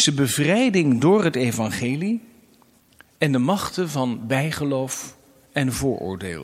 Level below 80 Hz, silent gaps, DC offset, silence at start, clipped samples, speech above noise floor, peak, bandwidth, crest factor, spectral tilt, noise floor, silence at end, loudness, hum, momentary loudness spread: -52 dBFS; none; under 0.1%; 0 s; under 0.1%; 35 dB; -4 dBFS; 16 kHz; 18 dB; -5 dB/octave; -56 dBFS; 0 s; -22 LUFS; none; 11 LU